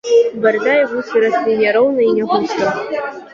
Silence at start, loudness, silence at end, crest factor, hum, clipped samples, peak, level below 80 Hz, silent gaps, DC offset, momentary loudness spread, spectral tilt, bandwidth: 0.05 s; -15 LUFS; 0.05 s; 12 dB; none; under 0.1%; -2 dBFS; -62 dBFS; none; under 0.1%; 6 LU; -5 dB/octave; 7.4 kHz